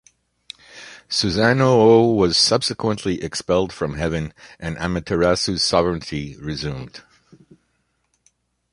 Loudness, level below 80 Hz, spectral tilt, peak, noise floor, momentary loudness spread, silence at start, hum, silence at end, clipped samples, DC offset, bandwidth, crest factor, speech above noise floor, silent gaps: -19 LUFS; -42 dBFS; -4.5 dB/octave; -2 dBFS; -69 dBFS; 21 LU; 0.75 s; none; 1.75 s; under 0.1%; under 0.1%; 11.5 kHz; 20 dB; 49 dB; none